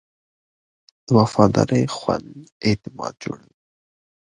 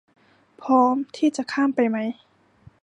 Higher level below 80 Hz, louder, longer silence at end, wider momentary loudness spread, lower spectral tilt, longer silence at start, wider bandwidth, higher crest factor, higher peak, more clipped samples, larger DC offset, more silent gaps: first, -50 dBFS vs -70 dBFS; about the same, -20 LUFS vs -22 LUFS; first, 0.85 s vs 0.7 s; about the same, 16 LU vs 14 LU; first, -6.5 dB/octave vs -5 dB/octave; first, 1.1 s vs 0.6 s; about the same, 10.5 kHz vs 10.5 kHz; about the same, 22 dB vs 18 dB; first, 0 dBFS vs -6 dBFS; neither; neither; first, 2.52-2.61 s vs none